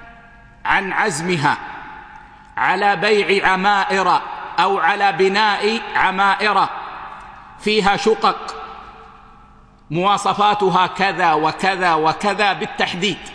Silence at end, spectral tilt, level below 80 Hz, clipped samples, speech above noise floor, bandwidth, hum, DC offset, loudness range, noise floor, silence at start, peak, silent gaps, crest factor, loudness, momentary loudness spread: 0 s; -4 dB/octave; -50 dBFS; under 0.1%; 29 dB; 10.5 kHz; none; under 0.1%; 4 LU; -46 dBFS; 0 s; 0 dBFS; none; 18 dB; -17 LUFS; 16 LU